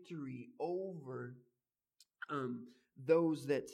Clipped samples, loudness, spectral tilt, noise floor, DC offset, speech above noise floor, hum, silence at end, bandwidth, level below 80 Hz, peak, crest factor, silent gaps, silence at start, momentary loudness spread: under 0.1%; -39 LUFS; -7 dB/octave; under -90 dBFS; under 0.1%; over 53 dB; none; 0 s; 13.5 kHz; -88 dBFS; -18 dBFS; 22 dB; none; 0 s; 17 LU